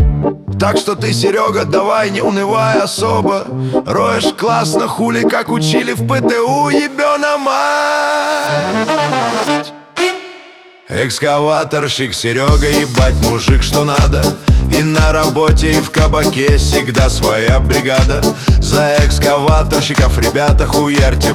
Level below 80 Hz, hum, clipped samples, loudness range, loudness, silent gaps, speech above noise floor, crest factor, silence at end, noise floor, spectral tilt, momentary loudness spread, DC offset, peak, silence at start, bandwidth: -18 dBFS; none; under 0.1%; 4 LU; -13 LUFS; none; 27 dB; 12 dB; 0 s; -39 dBFS; -5 dB/octave; 4 LU; under 0.1%; 0 dBFS; 0 s; 18 kHz